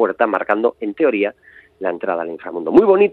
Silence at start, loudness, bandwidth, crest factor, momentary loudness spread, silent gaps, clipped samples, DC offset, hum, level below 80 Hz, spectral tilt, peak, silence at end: 0 s; -18 LUFS; 4.4 kHz; 16 dB; 13 LU; none; under 0.1%; under 0.1%; none; -58 dBFS; -8 dB/octave; 0 dBFS; 0 s